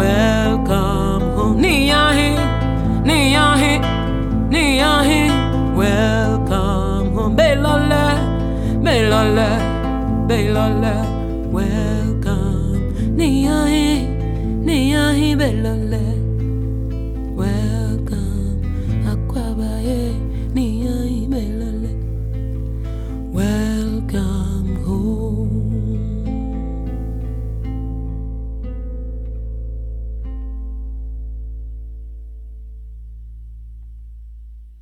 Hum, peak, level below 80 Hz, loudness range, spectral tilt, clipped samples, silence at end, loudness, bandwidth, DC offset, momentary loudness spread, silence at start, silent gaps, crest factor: none; -2 dBFS; -24 dBFS; 14 LU; -6 dB/octave; under 0.1%; 0 s; -18 LUFS; 15.5 kHz; under 0.1%; 16 LU; 0 s; none; 16 dB